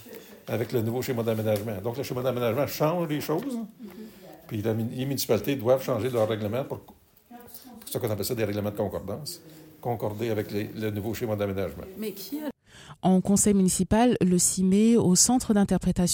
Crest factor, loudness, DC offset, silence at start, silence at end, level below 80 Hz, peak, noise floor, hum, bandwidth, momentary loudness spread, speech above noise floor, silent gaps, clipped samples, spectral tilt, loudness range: 18 dB; -26 LUFS; under 0.1%; 0 s; 0 s; -50 dBFS; -8 dBFS; -50 dBFS; none; 17 kHz; 16 LU; 25 dB; none; under 0.1%; -5 dB/octave; 10 LU